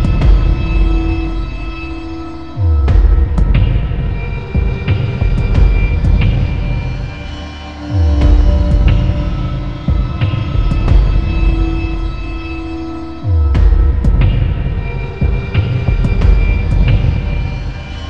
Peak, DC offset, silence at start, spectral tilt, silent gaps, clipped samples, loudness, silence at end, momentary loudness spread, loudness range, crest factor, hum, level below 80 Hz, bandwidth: 0 dBFS; 2%; 0 s; -8.5 dB/octave; none; under 0.1%; -15 LUFS; 0 s; 11 LU; 2 LU; 12 dB; none; -14 dBFS; 6 kHz